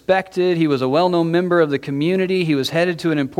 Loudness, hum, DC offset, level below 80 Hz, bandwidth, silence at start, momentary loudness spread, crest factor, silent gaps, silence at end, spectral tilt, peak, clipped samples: -18 LUFS; none; under 0.1%; -58 dBFS; 14 kHz; 0.1 s; 3 LU; 14 dB; none; 0.05 s; -6.5 dB/octave; -4 dBFS; under 0.1%